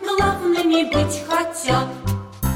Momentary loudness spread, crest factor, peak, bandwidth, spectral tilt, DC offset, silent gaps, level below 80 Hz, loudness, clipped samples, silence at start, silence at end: 7 LU; 14 dB; -6 dBFS; 16.5 kHz; -5 dB/octave; under 0.1%; none; -36 dBFS; -20 LUFS; under 0.1%; 0 s; 0 s